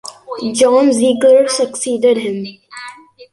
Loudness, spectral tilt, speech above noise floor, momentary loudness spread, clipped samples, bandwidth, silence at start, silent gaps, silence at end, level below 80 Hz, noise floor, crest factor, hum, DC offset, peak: -13 LUFS; -3.5 dB/octave; 23 dB; 21 LU; under 0.1%; 11.5 kHz; 0.05 s; none; 0.1 s; -60 dBFS; -36 dBFS; 12 dB; none; under 0.1%; -2 dBFS